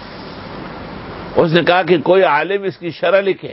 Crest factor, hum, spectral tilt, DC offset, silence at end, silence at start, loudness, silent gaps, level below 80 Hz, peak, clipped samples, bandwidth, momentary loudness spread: 16 dB; none; -9 dB/octave; under 0.1%; 0 s; 0 s; -14 LUFS; none; -46 dBFS; 0 dBFS; under 0.1%; 5.8 kHz; 18 LU